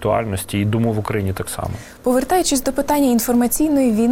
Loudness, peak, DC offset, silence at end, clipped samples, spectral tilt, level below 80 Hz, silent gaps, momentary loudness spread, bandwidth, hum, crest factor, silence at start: -18 LUFS; -4 dBFS; under 0.1%; 0 s; under 0.1%; -5 dB/octave; -40 dBFS; none; 9 LU; 17 kHz; none; 14 dB; 0 s